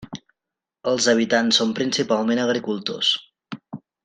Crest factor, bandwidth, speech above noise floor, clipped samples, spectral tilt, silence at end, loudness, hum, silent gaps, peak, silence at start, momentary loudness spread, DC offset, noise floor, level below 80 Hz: 20 dB; 9.8 kHz; 66 dB; under 0.1%; -3 dB/octave; 0.25 s; -21 LUFS; none; none; -4 dBFS; 0 s; 21 LU; under 0.1%; -87 dBFS; -66 dBFS